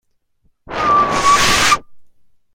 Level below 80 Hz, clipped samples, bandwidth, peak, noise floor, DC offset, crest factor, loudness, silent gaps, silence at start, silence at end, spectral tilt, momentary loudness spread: -38 dBFS; under 0.1%; 16.5 kHz; 0 dBFS; -60 dBFS; under 0.1%; 16 dB; -13 LUFS; none; 0.7 s; 0.5 s; -1.5 dB/octave; 8 LU